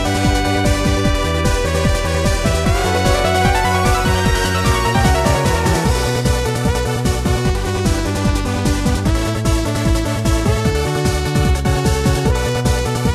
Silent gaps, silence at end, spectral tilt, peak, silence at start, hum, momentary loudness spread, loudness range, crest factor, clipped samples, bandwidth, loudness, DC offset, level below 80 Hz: none; 0 s; -5 dB/octave; 0 dBFS; 0 s; none; 3 LU; 3 LU; 14 dB; under 0.1%; 14 kHz; -16 LUFS; under 0.1%; -22 dBFS